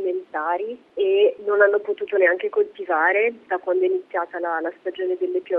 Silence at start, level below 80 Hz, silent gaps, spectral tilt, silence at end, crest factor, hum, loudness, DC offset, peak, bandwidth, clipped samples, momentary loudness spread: 0 s; -76 dBFS; none; -6 dB/octave; 0 s; 18 dB; none; -22 LUFS; under 0.1%; -4 dBFS; 3.8 kHz; under 0.1%; 9 LU